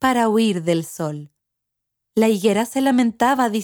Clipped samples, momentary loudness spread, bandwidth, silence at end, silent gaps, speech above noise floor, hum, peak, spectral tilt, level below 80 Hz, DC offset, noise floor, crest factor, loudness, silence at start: under 0.1%; 10 LU; 20 kHz; 0 s; none; 61 dB; none; -4 dBFS; -5 dB/octave; -60 dBFS; under 0.1%; -80 dBFS; 16 dB; -19 LUFS; 0 s